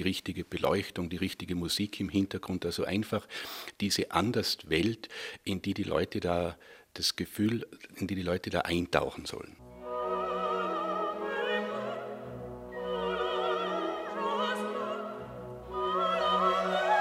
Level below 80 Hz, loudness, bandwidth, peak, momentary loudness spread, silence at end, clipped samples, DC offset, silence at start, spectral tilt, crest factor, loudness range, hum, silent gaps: -58 dBFS; -32 LUFS; 16 kHz; -8 dBFS; 12 LU; 0 s; under 0.1%; under 0.1%; 0 s; -4.5 dB/octave; 24 dB; 2 LU; none; none